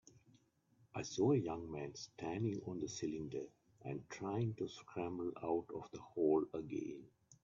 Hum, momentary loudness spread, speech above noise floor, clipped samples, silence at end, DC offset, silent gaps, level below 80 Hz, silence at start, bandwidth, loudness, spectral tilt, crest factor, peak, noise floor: none; 14 LU; 33 dB; under 0.1%; 0.1 s; under 0.1%; none; -74 dBFS; 0.15 s; 7.4 kHz; -42 LUFS; -7 dB/octave; 18 dB; -24 dBFS; -74 dBFS